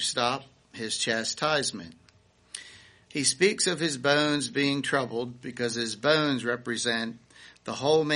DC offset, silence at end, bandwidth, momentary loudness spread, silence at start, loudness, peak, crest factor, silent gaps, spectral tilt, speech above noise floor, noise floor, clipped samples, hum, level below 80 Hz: under 0.1%; 0 s; 10.5 kHz; 18 LU; 0 s; -27 LUFS; -8 dBFS; 20 dB; none; -3 dB/octave; 34 dB; -61 dBFS; under 0.1%; none; -68 dBFS